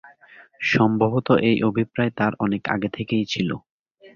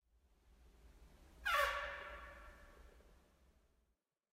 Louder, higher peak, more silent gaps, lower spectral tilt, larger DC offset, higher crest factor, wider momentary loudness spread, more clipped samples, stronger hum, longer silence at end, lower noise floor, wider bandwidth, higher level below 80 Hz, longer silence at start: first, -22 LUFS vs -40 LUFS; first, -4 dBFS vs -24 dBFS; first, 3.70-3.86 s, 3.94-3.98 s vs none; first, -7 dB/octave vs -1.5 dB/octave; neither; second, 18 dB vs 24 dB; second, 7 LU vs 25 LU; neither; neither; second, 0.1 s vs 1.2 s; second, -50 dBFS vs -85 dBFS; second, 7.2 kHz vs 16 kHz; first, -56 dBFS vs -64 dBFS; second, 0.05 s vs 0.6 s